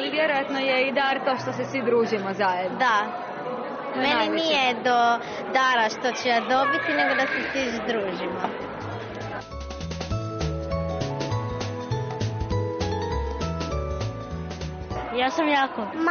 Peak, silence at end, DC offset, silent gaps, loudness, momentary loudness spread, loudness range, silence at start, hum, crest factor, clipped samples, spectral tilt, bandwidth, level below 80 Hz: -10 dBFS; 0 s; under 0.1%; none; -25 LUFS; 12 LU; 8 LU; 0 s; none; 16 dB; under 0.1%; -3 dB/octave; 6.8 kHz; -42 dBFS